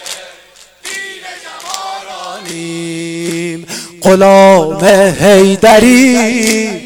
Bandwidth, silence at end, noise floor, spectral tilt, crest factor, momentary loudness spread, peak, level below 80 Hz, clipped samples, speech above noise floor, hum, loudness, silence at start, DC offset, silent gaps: 18 kHz; 0 s; -41 dBFS; -4.5 dB/octave; 10 dB; 19 LU; 0 dBFS; -42 dBFS; 0.6%; 34 dB; none; -8 LUFS; 0 s; under 0.1%; none